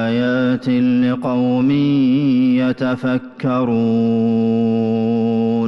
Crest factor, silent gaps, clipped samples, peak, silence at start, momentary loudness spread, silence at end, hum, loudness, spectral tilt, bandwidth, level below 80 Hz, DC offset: 8 dB; none; under 0.1%; -8 dBFS; 0 s; 4 LU; 0 s; none; -16 LUFS; -9 dB/octave; 5.8 kHz; -56 dBFS; under 0.1%